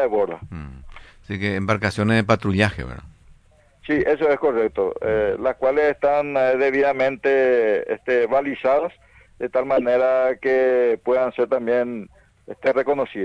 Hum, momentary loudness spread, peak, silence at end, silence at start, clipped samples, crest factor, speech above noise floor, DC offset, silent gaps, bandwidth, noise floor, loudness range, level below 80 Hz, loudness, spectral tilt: none; 13 LU; -4 dBFS; 0 s; 0 s; under 0.1%; 18 dB; 35 dB; under 0.1%; none; 10.5 kHz; -54 dBFS; 3 LU; -48 dBFS; -20 LUFS; -7 dB/octave